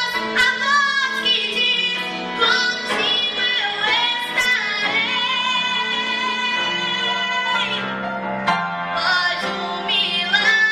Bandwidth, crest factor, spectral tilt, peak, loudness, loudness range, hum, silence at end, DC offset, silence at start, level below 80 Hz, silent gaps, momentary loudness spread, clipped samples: 15 kHz; 16 dB; -1.5 dB/octave; -4 dBFS; -18 LUFS; 3 LU; none; 0 s; under 0.1%; 0 s; -60 dBFS; none; 6 LU; under 0.1%